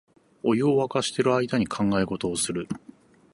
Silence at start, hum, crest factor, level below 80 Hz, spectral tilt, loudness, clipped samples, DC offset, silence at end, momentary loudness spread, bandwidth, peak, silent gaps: 0.45 s; none; 18 dB; -56 dBFS; -5 dB/octave; -25 LUFS; under 0.1%; under 0.1%; 0.55 s; 9 LU; 11.5 kHz; -8 dBFS; none